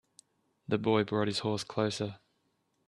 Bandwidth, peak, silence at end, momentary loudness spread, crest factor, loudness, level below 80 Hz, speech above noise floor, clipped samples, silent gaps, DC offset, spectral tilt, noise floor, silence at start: 12 kHz; -12 dBFS; 0.7 s; 9 LU; 20 dB; -32 LUFS; -70 dBFS; 45 dB; under 0.1%; none; under 0.1%; -5.5 dB/octave; -76 dBFS; 0.7 s